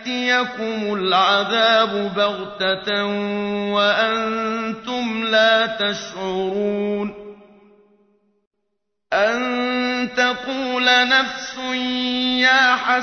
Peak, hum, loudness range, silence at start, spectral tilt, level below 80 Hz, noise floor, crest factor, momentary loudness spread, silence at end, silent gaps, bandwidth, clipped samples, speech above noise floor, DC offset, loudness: -4 dBFS; none; 7 LU; 0 s; -3.5 dB/octave; -58 dBFS; -77 dBFS; 16 dB; 10 LU; 0 s; 8.47-8.51 s; 6.6 kHz; under 0.1%; 58 dB; under 0.1%; -19 LUFS